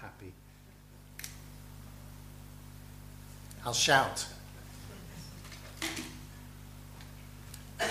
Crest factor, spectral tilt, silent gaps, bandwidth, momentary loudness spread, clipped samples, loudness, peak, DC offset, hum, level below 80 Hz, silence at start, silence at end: 28 dB; -2.5 dB/octave; none; 15.5 kHz; 22 LU; under 0.1%; -32 LUFS; -10 dBFS; under 0.1%; 50 Hz at -50 dBFS; -54 dBFS; 0 s; 0 s